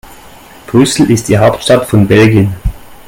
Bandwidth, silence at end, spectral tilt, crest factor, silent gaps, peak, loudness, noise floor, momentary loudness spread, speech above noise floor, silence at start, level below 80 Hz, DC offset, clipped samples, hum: 17 kHz; 0.15 s; -6 dB/octave; 10 dB; none; 0 dBFS; -9 LUFS; -35 dBFS; 8 LU; 27 dB; 0.1 s; -28 dBFS; under 0.1%; 0.3%; none